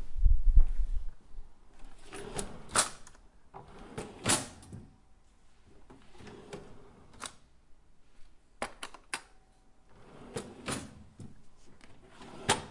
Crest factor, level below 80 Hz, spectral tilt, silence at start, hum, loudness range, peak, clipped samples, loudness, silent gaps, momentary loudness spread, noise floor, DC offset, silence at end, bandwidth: 24 dB; -34 dBFS; -3 dB/octave; 0 s; none; 16 LU; -8 dBFS; under 0.1%; -35 LUFS; none; 27 LU; -60 dBFS; under 0.1%; 0.05 s; 11.5 kHz